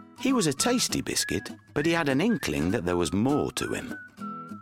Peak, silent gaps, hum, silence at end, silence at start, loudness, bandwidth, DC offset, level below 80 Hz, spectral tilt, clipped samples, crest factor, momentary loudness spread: -10 dBFS; none; none; 0 s; 0 s; -26 LUFS; 16.5 kHz; under 0.1%; -54 dBFS; -4 dB/octave; under 0.1%; 16 dB; 13 LU